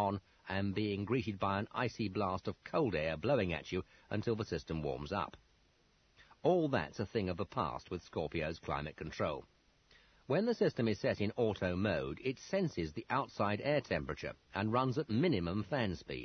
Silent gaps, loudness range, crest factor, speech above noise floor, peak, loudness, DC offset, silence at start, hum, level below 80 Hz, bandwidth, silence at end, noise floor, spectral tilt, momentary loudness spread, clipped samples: none; 3 LU; 20 dB; 35 dB; -18 dBFS; -37 LUFS; under 0.1%; 0 s; none; -62 dBFS; 6.4 kHz; 0 s; -71 dBFS; -5.5 dB/octave; 8 LU; under 0.1%